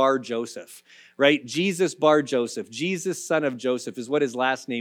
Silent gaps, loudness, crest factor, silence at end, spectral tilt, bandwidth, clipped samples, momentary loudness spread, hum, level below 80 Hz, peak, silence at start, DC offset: none; -24 LUFS; 18 dB; 0 s; -4 dB/octave; 17 kHz; under 0.1%; 10 LU; none; -82 dBFS; -6 dBFS; 0 s; under 0.1%